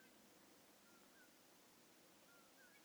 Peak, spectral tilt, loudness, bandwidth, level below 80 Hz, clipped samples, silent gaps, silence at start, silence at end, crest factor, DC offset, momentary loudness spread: -56 dBFS; -2 dB/octave; -67 LUFS; over 20 kHz; under -90 dBFS; under 0.1%; none; 0 s; 0 s; 14 dB; under 0.1%; 1 LU